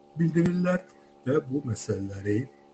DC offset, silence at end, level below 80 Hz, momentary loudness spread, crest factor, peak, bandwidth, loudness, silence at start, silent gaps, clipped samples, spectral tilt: under 0.1%; 0.25 s; -60 dBFS; 7 LU; 16 dB; -12 dBFS; 8.6 kHz; -28 LUFS; 0.15 s; none; under 0.1%; -7.5 dB/octave